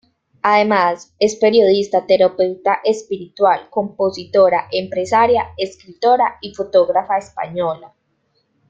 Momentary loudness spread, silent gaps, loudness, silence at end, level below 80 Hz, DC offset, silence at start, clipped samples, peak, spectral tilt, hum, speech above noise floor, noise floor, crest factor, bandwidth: 10 LU; none; -16 LUFS; 0.85 s; -58 dBFS; under 0.1%; 0.45 s; under 0.1%; -2 dBFS; -4.5 dB/octave; none; 49 dB; -65 dBFS; 16 dB; 7.8 kHz